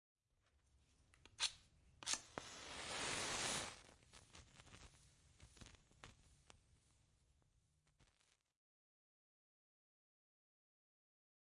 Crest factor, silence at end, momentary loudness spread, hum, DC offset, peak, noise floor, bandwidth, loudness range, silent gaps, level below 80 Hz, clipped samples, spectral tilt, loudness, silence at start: 32 dB; 3.45 s; 23 LU; none; under 0.1%; -22 dBFS; -81 dBFS; 12 kHz; 22 LU; none; -74 dBFS; under 0.1%; -1 dB/octave; -45 LUFS; 1.25 s